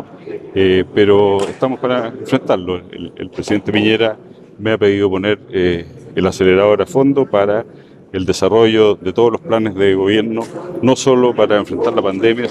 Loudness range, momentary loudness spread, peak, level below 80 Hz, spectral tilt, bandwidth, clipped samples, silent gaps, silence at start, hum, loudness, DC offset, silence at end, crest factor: 3 LU; 12 LU; 0 dBFS; -50 dBFS; -5.5 dB/octave; 11.5 kHz; under 0.1%; none; 0 s; none; -14 LUFS; under 0.1%; 0 s; 14 dB